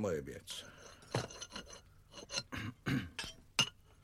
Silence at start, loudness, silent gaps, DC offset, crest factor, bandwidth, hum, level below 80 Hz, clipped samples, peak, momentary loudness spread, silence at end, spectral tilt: 0 s; -40 LUFS; none; under 0.1%; 26 dB; 16.5 kHz; none; -62 dBFS; under 0.1%; -16 dBFS; 20 LU; 0.1 s; -3.5 dB/octave